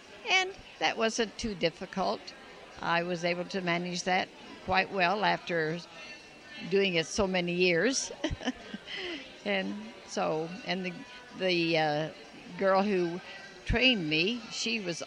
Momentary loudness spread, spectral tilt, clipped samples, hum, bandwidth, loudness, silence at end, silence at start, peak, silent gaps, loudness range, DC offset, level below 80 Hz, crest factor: 17 LU; -4 dB/octave; under 0.1%; none; 11 kHz; -30 LUFS; 0 s; 0 s; -12 dBFS; none; 4 LU; under 0.1%; -52 dBFS; 20 dB